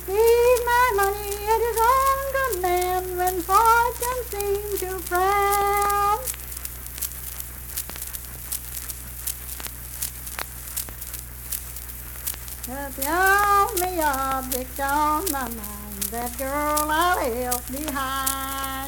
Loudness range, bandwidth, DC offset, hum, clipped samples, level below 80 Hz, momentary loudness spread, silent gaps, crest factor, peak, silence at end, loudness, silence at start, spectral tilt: 9 LU; 19.5 kHz; under 0.1%; none; under 0.1%; -40 dBFS; 13 LU; none; 18 dB; -6 dBFS; 0 s; -23 LUFS; 0 s; -3 dB/octave